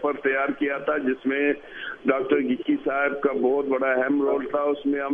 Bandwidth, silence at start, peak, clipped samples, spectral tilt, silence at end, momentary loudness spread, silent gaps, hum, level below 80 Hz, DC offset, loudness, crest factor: 3.7 kHz; 0 s; -6 dBFS; under 0.1%; -7.5 dB/octave; 0 s; 3 LU; none; none; -62 dBFS; under 0.1%; -24 LUFS; 16 dB